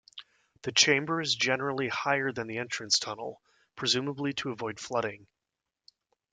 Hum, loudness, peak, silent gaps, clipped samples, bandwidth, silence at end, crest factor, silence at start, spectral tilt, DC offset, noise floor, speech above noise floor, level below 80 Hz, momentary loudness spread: none; -29 LUFS; -8 dBFS; none; under 0.1%; 11 kHz; 1.1 s; 24 dB; 0.15 s; -2.5 dB/octave; under 0.1%; -88 dBFS; 57 dB; -72 dBFS; 14 LU